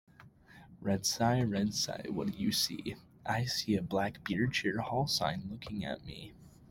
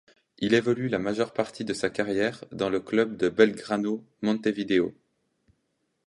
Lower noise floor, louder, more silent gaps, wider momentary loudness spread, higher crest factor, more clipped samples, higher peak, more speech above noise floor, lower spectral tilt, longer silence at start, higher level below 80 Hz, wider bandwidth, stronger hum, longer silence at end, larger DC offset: second, -58 dBFS vs -76 dBFS; second, -34 LUFS vs -27 LUFS; neither; first, 12 LU vs 8 LU; about the same, 20 dB vs 22 dB; neither; second, -16 dBFS vs -6 dBFS; second, 24 dB vs 50 dB; second, -4 dB/octave vs -5.5 dB/octave; second, 0.2 s vs 0.4 s; about the same, -62 dBFS vs -64 dBFS; first, 16.5 kHz vs 11.5 kHz; neither; second, 0.05 s vs 1.15 s; neither